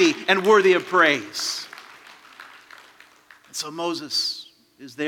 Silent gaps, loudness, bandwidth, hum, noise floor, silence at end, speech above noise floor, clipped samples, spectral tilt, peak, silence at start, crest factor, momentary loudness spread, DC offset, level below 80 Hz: none; -20 LUFS; 17.5 kHz; none; -52 dBFS; 0 s; 31 dB; under 0.1%; -3 dB/octave; -2 dBFS; 0 s; 22 dB; 19 LU; under 0.1%; -80 dBFS